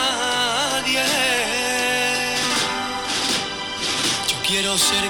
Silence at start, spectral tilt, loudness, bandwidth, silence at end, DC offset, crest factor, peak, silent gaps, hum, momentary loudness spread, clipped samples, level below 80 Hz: 0 s; -1 dB/octave; -19 LUFS; 19 kHz; 0 s; under 0.1%; 12 dB; -10 dBFS; none; none; 5 LU; under 0.1%; -50 dBFS